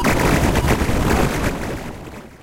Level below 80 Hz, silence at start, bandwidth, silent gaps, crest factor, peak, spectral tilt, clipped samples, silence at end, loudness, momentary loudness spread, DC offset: -26 dBFS; 0 s; 17 kHz; none; 14 dB; -4 dBFS; -5.5 dB/octave; under 0.1%; 0.05 s; -19 LUFS; 16 LU; under 0.1%